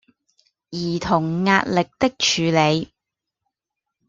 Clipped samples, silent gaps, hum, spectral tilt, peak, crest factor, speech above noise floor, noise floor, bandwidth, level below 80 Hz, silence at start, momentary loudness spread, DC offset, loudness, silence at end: under 0.1%; none; none; -4.5 dB/octave; -2 dBFS; 20 dB; 64 dB; -84 dBFS; 7.6 kHz; -54 dBFS; 0.7 s; 10 LU; under 0.1%; -20 LUFS; 1.25 s